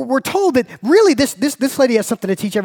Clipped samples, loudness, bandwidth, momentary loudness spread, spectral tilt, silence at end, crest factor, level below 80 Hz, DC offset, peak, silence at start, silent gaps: under 0.1%; -15 LUFS; 19 kHz; 7 LU; -4.5 dB/octave; 0 s; 14 dB; -54 dBFS; under 0.1%; -2 dBFS; 0 s; none